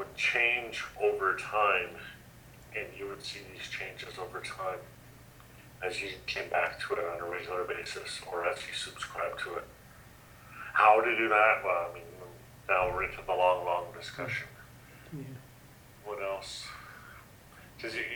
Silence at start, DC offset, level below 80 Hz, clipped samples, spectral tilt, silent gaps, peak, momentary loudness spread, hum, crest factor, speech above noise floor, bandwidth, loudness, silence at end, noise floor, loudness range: 0 s; under 0.1%; -60 dBFS; under 0.1%; -3.5 dB/octave; none; -8 dBFS; 23 LU; none; 24 dB; 23 dB; over 20 kHz; -31 LUFS; 0 s; -54 dBFS; 12 LU